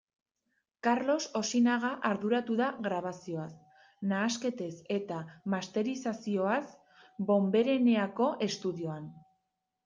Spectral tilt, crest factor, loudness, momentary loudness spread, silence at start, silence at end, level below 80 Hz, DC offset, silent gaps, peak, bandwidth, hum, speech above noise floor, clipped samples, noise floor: -5 dB/octave; 16 dB; -32 LUFS; 13 LU; 0.85 s; 0.65 s; -78 dBFS; under 0.1%; none; -16 dBFS; 9.4 kHz; none; 52 dB; under 0.1%; -83 dBFS